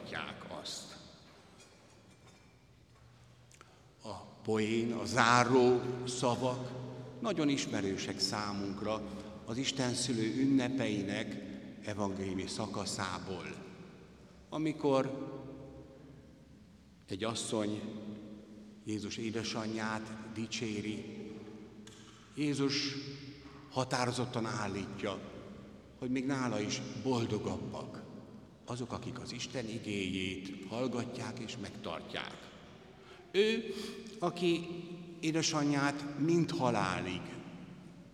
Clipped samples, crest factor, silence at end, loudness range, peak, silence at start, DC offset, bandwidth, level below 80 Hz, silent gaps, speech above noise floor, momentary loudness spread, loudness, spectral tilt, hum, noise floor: under 0.1%; 28 dB; 0 s; 9 LU; -10 dBFS; 0 s; under 0.1%; 13.5 kHz; -68 dBFS; none; 27 dB; 19 LU; -36 LUFS; -4.5 dB/octave; none; -62 dBFS